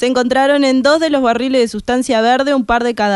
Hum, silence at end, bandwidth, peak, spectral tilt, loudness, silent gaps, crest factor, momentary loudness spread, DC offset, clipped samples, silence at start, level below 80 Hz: none; 0 s; 11.5 kHz; 0 dBFS; -4 dB/octave; -13 LUFS; none; 12 dB; 4 LU; under 0.1%; under 0.1%; 0 s; -42 dBFS